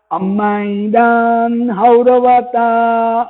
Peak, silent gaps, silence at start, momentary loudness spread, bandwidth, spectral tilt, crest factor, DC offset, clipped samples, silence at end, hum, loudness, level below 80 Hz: 0 dBFS; none; 0.1 s; 6 LU; 4.1 kHz; -12 dB/octave; 12 dB; under 0.1%; under 0.1%; 0 s; none; -12 LUFS; -56 dBFS